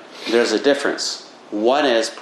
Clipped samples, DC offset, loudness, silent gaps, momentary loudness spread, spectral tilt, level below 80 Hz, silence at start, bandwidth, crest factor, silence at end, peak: under 0.1%; under 0.1%; -19 LUFS; none; 9 LU; -2.5 dB/octave; -72 dBFS; 0 s; 13 kHz; 16 dB; 0 s; -2 dBFS